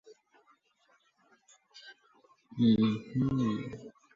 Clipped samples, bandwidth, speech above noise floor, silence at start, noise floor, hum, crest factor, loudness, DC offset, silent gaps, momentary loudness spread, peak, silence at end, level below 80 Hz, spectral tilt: under 0.1%; 7.4 kHz; 42 dB; 0.1 s; -70 dBFS; none; 18 dB; -30 LUFS; under 0.1%; none; 26 LU; -16 dBFS; 0.25 s; -62 dBFS; -8 dB/octave